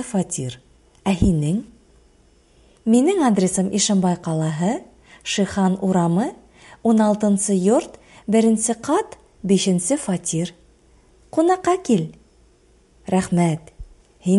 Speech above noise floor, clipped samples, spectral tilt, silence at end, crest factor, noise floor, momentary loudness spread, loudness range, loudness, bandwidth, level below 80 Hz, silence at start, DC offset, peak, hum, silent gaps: 36 dB; under 0.1%; -5.5 dB/octave; 0 s; 18 dB; -55 dBFS; 12 LU; 3 LU; -20 LUFS; 11.5 kHz; -44 dBFS; 0 s; under 0.1%; -2 dBFS; none; none